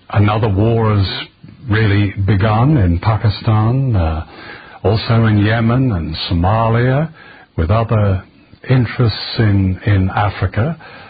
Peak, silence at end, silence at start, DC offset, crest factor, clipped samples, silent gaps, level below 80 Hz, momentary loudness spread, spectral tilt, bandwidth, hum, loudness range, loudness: -2 dBFS; 0 s; 0.1 s; under 0.1%; 12 dB; under 0.1%; none; -28 dBFS; 9 LU; -13 dB/octave; 5 kHz; none; 2 LU; -15 LUFS